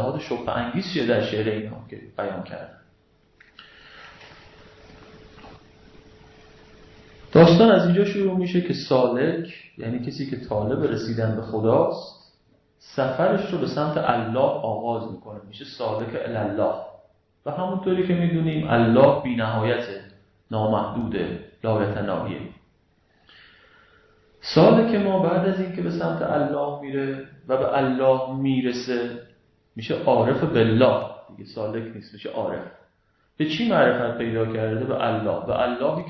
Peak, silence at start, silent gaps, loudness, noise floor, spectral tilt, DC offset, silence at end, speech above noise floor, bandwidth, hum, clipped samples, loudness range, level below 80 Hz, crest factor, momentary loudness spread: -4 dBFS; 0 s; none; -22 LUFS; -65 dBFS; -8 dB/octave; under 0.1%; 0 s; 43 dB; 6.2 kHz; none; under 0.1%; 9 LU; -54 dBFS; 20 dB; 18 LU